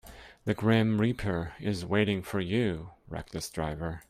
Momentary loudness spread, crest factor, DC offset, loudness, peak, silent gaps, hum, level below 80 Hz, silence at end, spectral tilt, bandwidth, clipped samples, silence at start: 14 LU; 18 dB; under 0.1%; -30 LUFS; -12 dBFS; none; none; -52 dBFS; 0.1 s; -6.5 dB/octave; 15 kHz; under 0.1%; 0.05 s